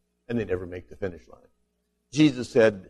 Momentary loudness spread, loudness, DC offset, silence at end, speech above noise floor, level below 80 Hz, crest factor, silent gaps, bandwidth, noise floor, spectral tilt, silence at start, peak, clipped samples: 14 LU; -26 LUFS; under 0.1%; 0.1 s; 49 dB; -56 dBFS; 20 dB; none; 11 kHz; -74 dBFS; -6 dB/octave; 0.3 s; -8 dBFS; under 0.1%